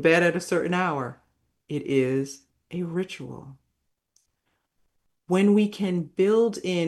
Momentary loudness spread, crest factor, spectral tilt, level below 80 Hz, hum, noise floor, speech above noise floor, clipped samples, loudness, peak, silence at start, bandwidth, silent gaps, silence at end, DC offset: 16 LU; 20 dB; -6 dB/octave; -68 dBFS; none; -76 dBFS; 53 dB; under 0.1%; -24 LUFS; -6 dBFS; 0 s; 12.5 kHz; none; 0 s; under 0.1%